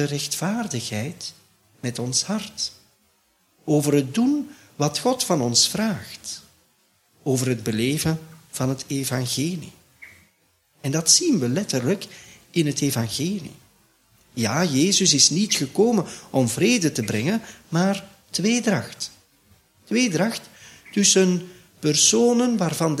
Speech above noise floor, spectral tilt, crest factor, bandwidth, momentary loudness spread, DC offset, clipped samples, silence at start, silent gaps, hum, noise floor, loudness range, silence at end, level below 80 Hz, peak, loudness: 42 dB; -3.5 dB/octave; 20 dB; 16 kHz; 16 LU; under 0.1%; under 0.1%; 0 s; none; none; -64 dBFS; 7 LU; 0 s; -60 dBFS; -2 dBFS; -21 LUFS